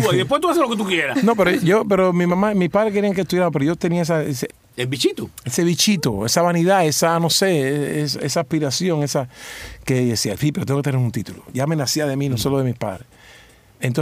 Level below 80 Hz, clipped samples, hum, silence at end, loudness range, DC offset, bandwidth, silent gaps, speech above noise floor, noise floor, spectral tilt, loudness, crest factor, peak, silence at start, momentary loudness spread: -50 dBFS; under 0.1%; none; 0 s; 4 LU; under 0.1%; 16 kHz; none; 29 dB; -48 dBFS; -5 dB/octave; -19 LUFS; 16 dB; -2 dBFS; 0 s; 11 LU